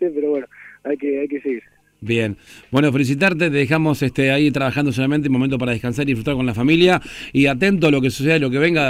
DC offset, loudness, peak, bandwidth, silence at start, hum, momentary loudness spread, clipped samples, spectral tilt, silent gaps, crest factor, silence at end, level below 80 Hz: under 0.1%; -18 LUFS; 0 dBFS; 15.5 kHz; 0 s; none; 10 LU; under 0.1%; -6.5 dB/octave; none; 18 dB; 0 s; -46 dBFS